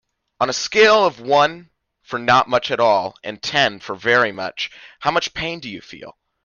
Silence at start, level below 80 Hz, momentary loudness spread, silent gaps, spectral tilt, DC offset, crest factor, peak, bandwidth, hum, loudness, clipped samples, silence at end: 0.4 s; -56 dBFS; 15 LU; none; -3 dB/octave; under 0.1%; 18 dB; -2 dBFS; 7.4 kHz; none; -18 LUFS; under 0.1%; 0.35 s